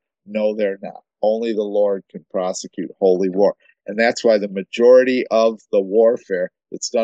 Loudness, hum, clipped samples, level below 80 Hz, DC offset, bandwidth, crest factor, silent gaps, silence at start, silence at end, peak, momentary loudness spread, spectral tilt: -18 LUFS; none; under 0.1%; -74 dBFS; under 0.1%; 8.4 kHz; 16 dB; none; 0.3 s; 0 s; -2 dBFS; 14 LU; -4.5 dB/octave